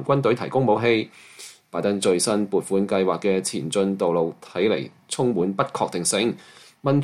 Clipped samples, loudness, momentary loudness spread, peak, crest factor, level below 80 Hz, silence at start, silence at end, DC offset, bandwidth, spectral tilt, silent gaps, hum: under 0.1%; -23 LUFS; 10 LU; -6 dBFS; 16 dB; -64 dBFS; 0 s; 0 s; under 0.1%; 15 kHz; -5 dB/octave; none; none